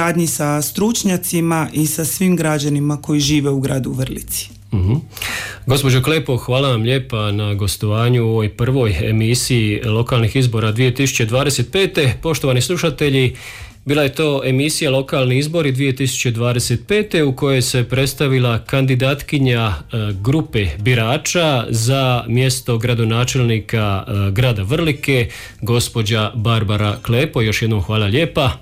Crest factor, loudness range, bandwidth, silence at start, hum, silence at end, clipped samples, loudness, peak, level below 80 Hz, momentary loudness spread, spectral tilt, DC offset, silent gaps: 12 dB; 2 LU; 16 kHz; 0 s; none; 0 s; under 0.1%; -17 LUFS; -4 dBFS; -38 dBFS; 4 LU; -5 dB/octave; under 0.1%; none